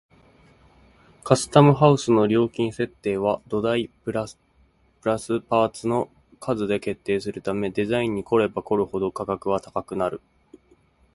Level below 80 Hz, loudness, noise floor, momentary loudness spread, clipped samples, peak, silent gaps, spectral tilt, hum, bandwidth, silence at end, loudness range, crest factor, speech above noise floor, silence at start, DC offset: -54 dBFS; -23 LUFS; -60 dBFS; 12 LU; under 0.1%; -2 dBFS; none; -6.5 dB/octave; none; 11.5 kHz; 0.95 s; 6 LU; 22 dB; 38 dB; 1.25 s; under 0.1%